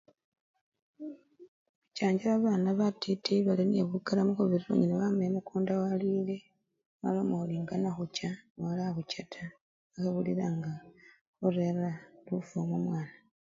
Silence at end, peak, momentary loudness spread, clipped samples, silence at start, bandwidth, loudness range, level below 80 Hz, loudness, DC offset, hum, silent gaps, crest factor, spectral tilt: 0.35 s; -14 dBFS; 16 LU; under 0.1%; 1 s; 7.6 kHz; 6 LU; -72 dBFS; -32 LUFS; under 0.1%; none; 1.48-1.82 s, 6.86-7.00 s, 8.50-8.55 s, 9.61-9.90 s, 11.21-11.33 s; 18 dB; -7.5 dB/octave